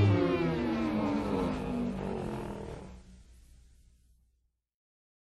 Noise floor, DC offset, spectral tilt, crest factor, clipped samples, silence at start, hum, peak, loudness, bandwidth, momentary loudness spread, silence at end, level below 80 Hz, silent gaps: -76 dBFS; under 0.1%; -8 dB/octave; 18 dB; under 0.1%; 0 s; none; -16 dBFS; -32 LUFS; 12 kHz; 16 LU; 2.05 s; -50 dBFS; none